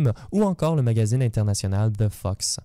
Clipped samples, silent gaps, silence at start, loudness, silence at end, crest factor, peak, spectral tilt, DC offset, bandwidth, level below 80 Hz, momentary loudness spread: under 0.1%; none; 0 s; -23 LUFS; 0.05 s; 12 dB; -10 dBFS; -6 dB/octave; under 0.1%; 15 kHz; -46 dBFS; 4 LU